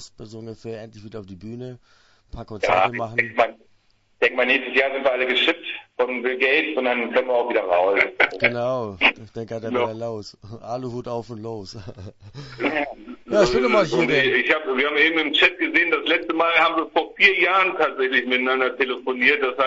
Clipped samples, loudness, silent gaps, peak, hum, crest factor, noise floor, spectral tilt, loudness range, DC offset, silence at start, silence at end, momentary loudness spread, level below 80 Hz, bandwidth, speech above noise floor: under 0.1%; -20 LUFS; none; 0 dBFS; none; 22 dB; -60 dBFS; -4.5 dB/octave; 9 LU; under 0.1%; 0 s; 0 s; 20 LU; -54 dBFS; 8 kHz; 39 dB